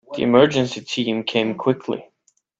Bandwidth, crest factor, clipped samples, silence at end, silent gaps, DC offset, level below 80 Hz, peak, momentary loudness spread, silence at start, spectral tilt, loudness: 8 kHz; 20 dB; under 0.1%; 0.55 s; none; under 0.1%; -62 dBFS; 0 dBFS; 11 LU; 0.1 s; -5.5 dB/octave; -20 LUFS